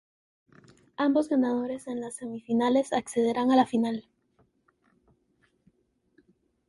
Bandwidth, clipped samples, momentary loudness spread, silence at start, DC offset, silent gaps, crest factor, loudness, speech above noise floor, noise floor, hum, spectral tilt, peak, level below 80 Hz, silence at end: 11.5 kHz; under 0.1%; 13 LU; 1 s; under 0.1%; none; 18 dB; -27 LUFS; 44 dB; -70 dBFS; none; -5 dB/octave; -10 dBFS; -70 dBFS; 2.7 s